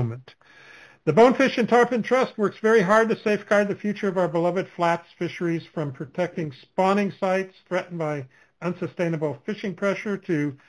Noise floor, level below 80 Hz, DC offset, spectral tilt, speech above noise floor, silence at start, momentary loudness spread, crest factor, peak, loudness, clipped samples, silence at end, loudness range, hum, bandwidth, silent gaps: -49 dBFS; -66 dBFS; under 0.1%; -6.5 dB/octave; 26 dB; 0 s; 13 LU; 20 dB; -4 dBFS; -23 LUFS; under 0.1%; 0.15 s; 7 LU; none; 11 kHz; none